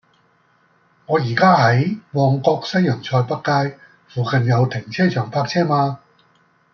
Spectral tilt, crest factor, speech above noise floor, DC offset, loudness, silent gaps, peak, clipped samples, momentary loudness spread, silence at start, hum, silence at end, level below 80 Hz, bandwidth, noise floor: -7 dB/octave; 18 dB; 41 dB; under 0.1%; -18 LUFS; none; -2 dBFS; under 0.1%; 8 LU; 1.1 s; none; 0.75 s; -60 dBFS; 6.8 kHz; -59 dBFS